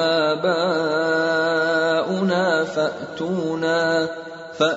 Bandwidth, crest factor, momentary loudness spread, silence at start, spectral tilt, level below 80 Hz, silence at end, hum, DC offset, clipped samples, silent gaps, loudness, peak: 8 kHz; 14 dB; 7 LU; 0 s; -5 dB/octave; -64 dBFS; 0 s; none; under 0.1%; under 0.1%; none; -21 LUFS; -6 dBFS